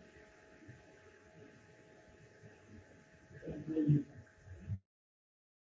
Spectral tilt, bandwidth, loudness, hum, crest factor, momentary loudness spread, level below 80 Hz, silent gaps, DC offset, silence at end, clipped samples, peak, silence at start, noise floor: -9.5 dB/octave; 7.6 kHz; -38 LUFS; none; 24 dB; 27 LU; -64 dBFS; none; under 0.1%; 0.85 s; under 0.1%; -20 dBFS; 0.15 s; -62 dBFS